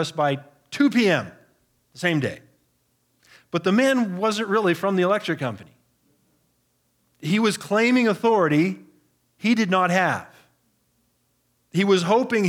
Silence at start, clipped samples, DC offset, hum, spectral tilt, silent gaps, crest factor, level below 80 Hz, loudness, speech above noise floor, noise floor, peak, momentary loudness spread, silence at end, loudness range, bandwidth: 0 s; under 0.1%; under 0.1%; 60 Hz at -50 dBFS; -5.5 dB/octave; none; 18 dB; -76 dBFS; -22 LUFS; 48 dB; -68 dBFS; -6 dBFS; 12 LU; 0 s; 4 LU; 16.5 kHz